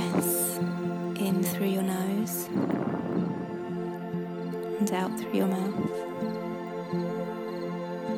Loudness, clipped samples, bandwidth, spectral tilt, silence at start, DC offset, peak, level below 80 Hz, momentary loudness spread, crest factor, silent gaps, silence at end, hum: -30 LUFS; under 0.1%; 17.5 kHz; -5.5 dB/octave; 0 s; under 0.1%; -12 dBFS; -68 dBFS; 7 LU; 16 dB; none; 0 s; none